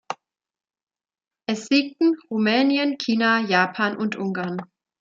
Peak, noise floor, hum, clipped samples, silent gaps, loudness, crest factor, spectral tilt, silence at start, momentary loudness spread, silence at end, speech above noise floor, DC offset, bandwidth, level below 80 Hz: -4 dBFS; -54 dBFS; none; under 0.1%; none; -22 LUFS; 20 dB; -5 dB/octave; 0.1 s; 13 LU; 0.35 s; 32 dB; under 0.1%; 7.8 kHz; -74 dBFS